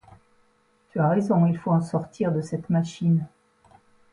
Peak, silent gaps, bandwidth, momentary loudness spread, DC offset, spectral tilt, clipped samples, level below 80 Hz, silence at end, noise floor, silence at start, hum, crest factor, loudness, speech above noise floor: -10 dBFS; none; 10.5 kHz; 8 LU; under 0.1%; -8.5 dB/octave; under 0.1%; -62 dBFS; 0.85 s; -64 dBFS; 0.95 s; none; 14 dB; -24 LUFS; 41 dB